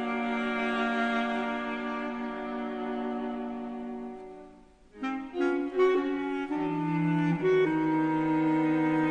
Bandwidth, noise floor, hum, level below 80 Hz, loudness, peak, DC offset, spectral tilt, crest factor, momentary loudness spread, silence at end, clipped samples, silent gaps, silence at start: 8.8 kHz; -54 dBFS; none; -60 dBFS; -29 LUFS; -14 dBFS; under 0.1%; -7.5 dB/octave; 16 dB; 12 LU; 0 s; under 0.1%; none; 0 s